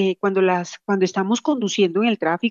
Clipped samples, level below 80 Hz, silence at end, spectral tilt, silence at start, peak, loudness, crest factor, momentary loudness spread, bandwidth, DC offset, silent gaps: under 0.1%; -78 dBFS; 0 s; -5 dB/octave; 0 s; -8 dBFS; -20 LUFS; 12 dB; 3 LU; 7.4 kHz; under 0.1%; none